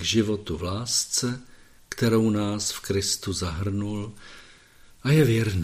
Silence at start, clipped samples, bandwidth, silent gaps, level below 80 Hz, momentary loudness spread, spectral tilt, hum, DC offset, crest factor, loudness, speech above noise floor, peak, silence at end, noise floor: 0 s; under 0.1%; 15.5 kHz; none; -48 dBFS; 15 LU; -4.5 dB/octave; none; under 0.1%; 18 dB; -25 LUFS; 27 dB; -8 dBFS; 0 s; -52 dBFS